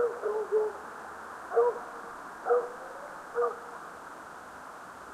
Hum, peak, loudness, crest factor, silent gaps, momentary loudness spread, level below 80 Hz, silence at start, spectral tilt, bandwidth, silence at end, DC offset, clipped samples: none; -14 dBFS; -33 LUFS; 18 dB; none; 16 LU; -72 dBFS; 0 s; -4 dB/octave; 13.5 kHz; 0 s; under 0.1%; under 0.1%